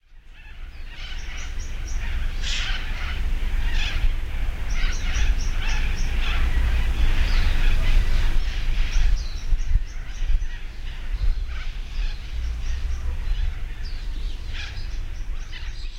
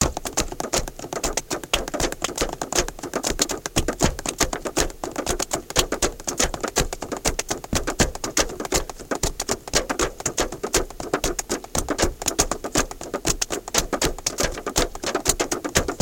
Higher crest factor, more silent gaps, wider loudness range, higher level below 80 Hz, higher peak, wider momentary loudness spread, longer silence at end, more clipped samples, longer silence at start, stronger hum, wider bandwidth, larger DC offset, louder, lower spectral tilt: second, 14 dB vs 22 dB; neither; first, 7 LU vs 1 LU; first, -22 dBFS vs -34 dBFS; second, -8 dBFS vs -2 dBFS; first, 11 LU vs 5 LU; about the same, 0 s vs 0 s; neither; first, 0.15 s vs 0 s; neither; second, 7.6 kHz vs 17 kHz; first, 0.2% vs under 0.1%; second, -29 LUFS vs -24 LUFS; first, -4 dB/octave vs -2.5 dB/octave